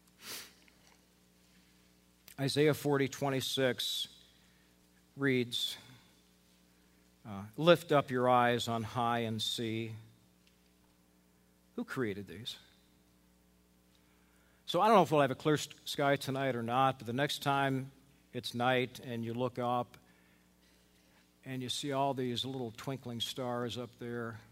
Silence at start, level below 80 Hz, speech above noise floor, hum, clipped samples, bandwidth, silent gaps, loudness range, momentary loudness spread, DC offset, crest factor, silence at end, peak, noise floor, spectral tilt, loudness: 0.2 s; -72 dBFS; 35 dB; 60 Hz at -65 dBFS; under 0.1%; 16 kHz; none; 11 LU; 17 LU; under 0.1%; 24 dB; 0.1 s; -10 dBFS; -68 dBFS; -5 dB/octave; -33 LUFS